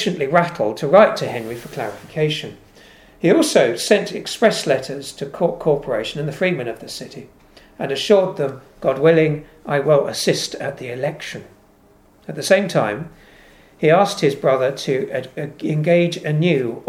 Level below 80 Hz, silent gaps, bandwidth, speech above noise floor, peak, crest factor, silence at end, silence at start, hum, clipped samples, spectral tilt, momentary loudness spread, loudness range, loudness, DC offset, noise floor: -56 dBFS; none; 16 kHz; 34 dB; 0 dBFS; 20 dB; 0.05 s; 0 s; none; under 0.1%; -5 dB/octave; 15 LU; 4 LU; -19 LUFS; under 0.1%; -52 dBFS